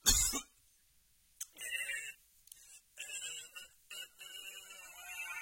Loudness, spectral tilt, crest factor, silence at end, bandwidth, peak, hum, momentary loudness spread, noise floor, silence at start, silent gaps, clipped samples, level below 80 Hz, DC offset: -40 LUFS; 0 dB/octave; 28 dB; 0 s; 16.5 kHz; -14 dBFS; none; 20 LU; -70 dBFS; 0.05 s; none; under 0.1%; -52 dBFS; under 0.1%